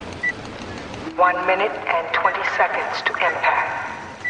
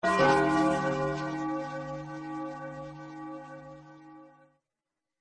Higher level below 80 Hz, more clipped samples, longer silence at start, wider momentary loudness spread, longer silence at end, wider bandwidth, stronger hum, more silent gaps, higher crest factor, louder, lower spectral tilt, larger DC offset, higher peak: first, -54 dBFS vs -60 dBFS; neither; about the same, 0 s vs 0 s; second, 13 LU vs 24 LU; second, 0 s vs 0.9 s; about the same, 10 kHz vs 10.5 kHz; neither; neither; about the same, 18 dB vs 22 dB; first, -20 LUFS vs -29 LUFS; second, -4 dB/octave vs -6 dB/octave; neither; first, -4 dBFS vs -10 dBFS